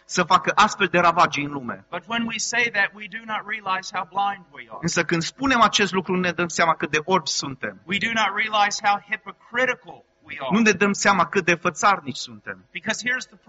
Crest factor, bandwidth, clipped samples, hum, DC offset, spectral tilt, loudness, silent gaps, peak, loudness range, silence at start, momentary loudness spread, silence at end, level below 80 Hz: 20 dB; 8 kHz; under 0.1%; none; under 0.1%; -2 dB/octave; -21 LUFS; none; -4 dBFS; 3 LU; 0.1 s; 14 LU; 0.25 s; -58 dBFS